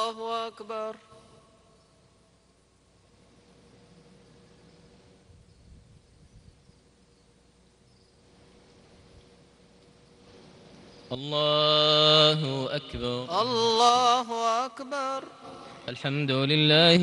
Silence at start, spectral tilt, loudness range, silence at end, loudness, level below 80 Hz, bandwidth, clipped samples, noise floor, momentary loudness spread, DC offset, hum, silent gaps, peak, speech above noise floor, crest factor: 0 s; -4.5 dB/octave; 19 LU; 0 s; -24 LUFS; -60 dBFS; 11.5 kHz; under 0.1%; -63 dBFS; 20 LU; under 0.1%; none; none; -6 dBFS; 39 dB; 24 dB